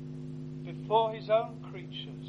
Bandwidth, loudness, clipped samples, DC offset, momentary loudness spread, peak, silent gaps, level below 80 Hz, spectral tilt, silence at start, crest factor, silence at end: 7.2 kHz; -32 LUFS; under 0.1%; under 0.1%; 13 LU; -14 dBFS; none; -66 dBFS; -7.5 dB/octave; 0 s; 20 dB; 0 s